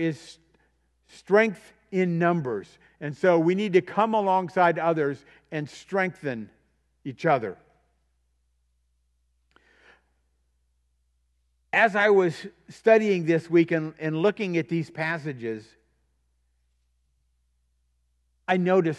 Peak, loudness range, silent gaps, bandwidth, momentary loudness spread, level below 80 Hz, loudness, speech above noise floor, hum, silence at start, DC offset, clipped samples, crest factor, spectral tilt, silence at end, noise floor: -6 dBFS; 10 LU; none; 11 kHz; 17 LU; -70 dBFS; -24 LUFS; 47 dB; none; 0 s; under 0.1%; under 0.1%; 22 dB; -7 dB/octave; 0 s; -71 dBFS